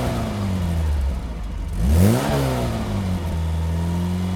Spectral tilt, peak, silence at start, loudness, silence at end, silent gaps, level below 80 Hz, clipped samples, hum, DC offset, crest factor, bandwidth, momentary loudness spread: -6.5 dB/octave; -2 dBFS; 0 s; -22 LUFS; 0 s; none; -26 dBFS; under 0.1%; none; under 0.1%; 18 dB; 19 kHz; 9 LU